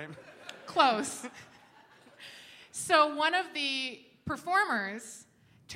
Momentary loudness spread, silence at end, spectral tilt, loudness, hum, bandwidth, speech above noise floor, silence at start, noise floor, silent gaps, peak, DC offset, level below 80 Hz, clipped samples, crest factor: 22 LU; 0 s; -2 dB/octave; -29 LUFS; none; 16 kHz; 29 dB; 0 s; -59 dBFS; none; -8 dBFS; under 0.1%; -70 dBFS; under 0.1%; 24 dB